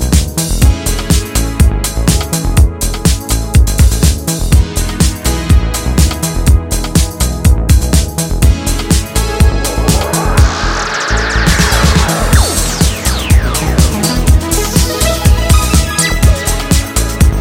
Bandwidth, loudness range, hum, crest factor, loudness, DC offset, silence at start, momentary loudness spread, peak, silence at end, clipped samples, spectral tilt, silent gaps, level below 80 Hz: 17 kHz; 2 LU; none; 10 dB; -12 LUFS; under 0.1%; 0 s; 4 LU; 0 dBFS; 0 s; 0.5%; -4.5 dB/octave; none; -12 dBFS